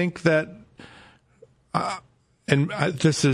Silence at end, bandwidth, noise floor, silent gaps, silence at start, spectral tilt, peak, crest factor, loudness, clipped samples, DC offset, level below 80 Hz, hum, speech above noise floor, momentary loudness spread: 0 s; 12 kHz; -56 dBFS; none; 0 s; -5.5 dB/octave; -4 dBFS; 20 dB; -24 LUFS; under 0.1%; under 0.1%; -60 dBFS; none; 34 dB; 16 LU